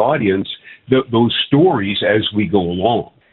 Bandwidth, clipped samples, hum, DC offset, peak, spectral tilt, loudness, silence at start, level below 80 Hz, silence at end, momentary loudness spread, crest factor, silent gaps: 4.4 kHz; under 0.1%; none; under 0.1%; 0 dBFS; -11 dB/octave; -16 LUFS; 0 s; -50 dBFS; 0.3 s; 8 LU; 16 dB; none